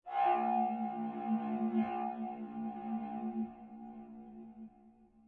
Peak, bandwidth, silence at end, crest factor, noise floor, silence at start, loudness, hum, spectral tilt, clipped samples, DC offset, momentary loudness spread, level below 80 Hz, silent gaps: -20 dBFS; 4.2 kHz; 0.2 s; 16 dB; -63 dBFS; 0.05 s; -37 LUFS; none; -9.5 dB/octave; under 0.1%; under 0.1%; 19 LU; -76 dBFS; none